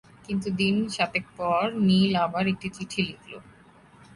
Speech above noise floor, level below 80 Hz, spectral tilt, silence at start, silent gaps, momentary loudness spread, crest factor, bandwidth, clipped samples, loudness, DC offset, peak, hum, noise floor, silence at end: 28 dB; -58 dBFS; -6 dB/octave; 0.3 s; none; 11 LU; 16 dB; 11.5 kHz; under 0.1%; -26 LUFS; under 0.1%; -10 dBFS; none; -54 dBFS; 0.1 s